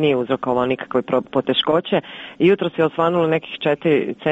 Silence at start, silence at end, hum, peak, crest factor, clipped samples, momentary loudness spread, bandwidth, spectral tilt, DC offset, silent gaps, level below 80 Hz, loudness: 0 s; 0 s; none; -4 dBFS; 14 dB; under 0.1%; 5 LU; 8 kHz; -7.5 dB/octave; under 0.1%; none; -58 dBFS; -19 LUFS